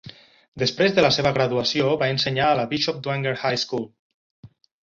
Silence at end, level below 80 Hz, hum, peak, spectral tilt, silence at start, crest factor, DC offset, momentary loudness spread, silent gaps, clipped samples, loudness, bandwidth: 0.4 s; -56 dBFS; none; -4 dBFS; -5 dB/octave; 0.05 s; 20 dB; under 0.1%; 7 LU; 0.48-0.52 s, 3.99-4.43 s; under 0.1%; -21 LUFS; 7.6 kHz